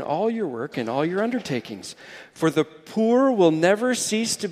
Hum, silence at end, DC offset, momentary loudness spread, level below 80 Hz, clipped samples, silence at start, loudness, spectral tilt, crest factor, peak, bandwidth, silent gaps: none; 0 s; under 0.1%; 17 LU; -68 dBFS; under 0.1%; 0 s; -22 LUFS; -4.5 dB/octave; 18 dB; -4 dBFS; 15.5 kHz; none